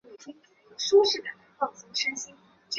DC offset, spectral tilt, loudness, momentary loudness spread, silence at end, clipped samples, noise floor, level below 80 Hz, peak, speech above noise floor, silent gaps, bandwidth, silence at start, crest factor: under 0.1%; -0.5 dB/octave; -26 LUFS; 25 LU; 0 s; under 0.1%; -50 dBFS; -76 dBFS; -10 dBFS; 24 dB; none; 7.8 kHz; 0.1 s; 20 dB